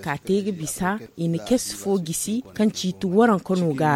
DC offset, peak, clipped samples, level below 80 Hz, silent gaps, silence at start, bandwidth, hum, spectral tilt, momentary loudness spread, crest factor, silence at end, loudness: under 0.1%; -6 dBFS; under 0.1%; -54 dBFS; none; 0 s; 16.5 kHz; none; -5 dB/octave; 8 LU; 16 dB; 0 s; -23 LUFS